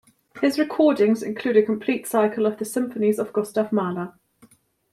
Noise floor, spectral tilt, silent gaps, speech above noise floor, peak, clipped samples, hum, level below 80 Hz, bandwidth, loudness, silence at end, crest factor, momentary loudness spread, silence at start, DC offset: -56 dBFS; -5.5 dB/octave; none; 35 dB; -6 dBFS; under 0.1%; none; -70 dBFS; 15 kHz; -22 LUFS; 0.8 s; 18 dB; 7 LU; 0.35 s; under 0.1%